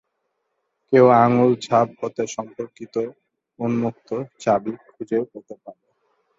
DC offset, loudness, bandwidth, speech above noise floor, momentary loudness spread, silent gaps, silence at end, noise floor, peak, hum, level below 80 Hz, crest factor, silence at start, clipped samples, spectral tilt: under 0.1%; -20 LUFS; 7.8 kHz; 54 dB; 20 LU; none; 0.65 s; -75 dBFS; -2 dBFS; none; -64 dBFS; 20 dB; 0.9 s; under 0.1%; -7 dB/octave